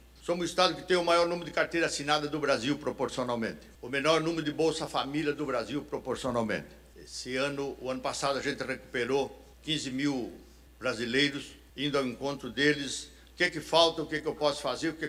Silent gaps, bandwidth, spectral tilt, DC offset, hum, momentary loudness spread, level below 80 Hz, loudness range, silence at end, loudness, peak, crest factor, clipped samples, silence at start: none; 16 kHz; -4 dB/octave; under 0.1%; none; 10 LU; -58 dBFS; 5 LU; 0 s; -30 LUFS; -10 dBFS; 20 dB; under 0.1%; 0.15 s